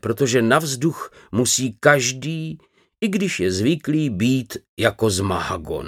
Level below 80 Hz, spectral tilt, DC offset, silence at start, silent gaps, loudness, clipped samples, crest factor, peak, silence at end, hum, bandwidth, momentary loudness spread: -50 dBFS; -4.5 dB/octave; under 0.1%; 0.05 s; 4.69-4.77 s; -20 LUFS; under 0.1%; 20 dB; 0 dBFS; 0 s; none; 17 kHz; 11 LU